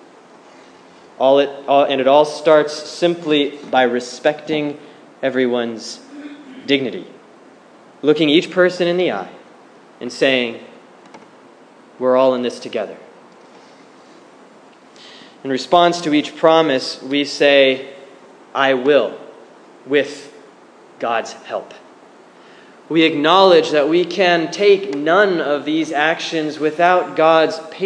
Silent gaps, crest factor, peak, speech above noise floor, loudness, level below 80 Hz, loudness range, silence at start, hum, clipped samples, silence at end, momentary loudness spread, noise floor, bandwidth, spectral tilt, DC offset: none; 18 dB; 0 dBFS; 29 dB; -16 LUFS; -72 dBFS; 8 LU; 1.2 s; none; under 0.1%; 0 s; 15 LU; -45 dBFS; 10.5 kHz; -4.5 dB/octave; under 0.1%